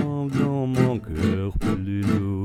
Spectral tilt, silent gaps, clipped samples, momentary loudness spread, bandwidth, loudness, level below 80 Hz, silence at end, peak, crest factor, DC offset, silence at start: -8 dB/octave; none; under 0.1%; 4 LU; 14.5 kHz; -24 LUFS; -38 dBFS; 0 s; -4 dBFS; 18 dB; under 0.1%; 0 s